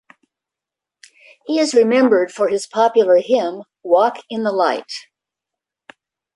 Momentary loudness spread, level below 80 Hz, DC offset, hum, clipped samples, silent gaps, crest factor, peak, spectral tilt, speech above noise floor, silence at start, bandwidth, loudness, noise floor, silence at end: 14 LU; -70 dBFS; under 0.1%; none; under 0.1%; none; 16 dB; -2 dBFS; -4 dB/octave; 70 dB; 1.5 s; 11.5 kHz; -16 LUFS; -86 dBFS; 1.35 s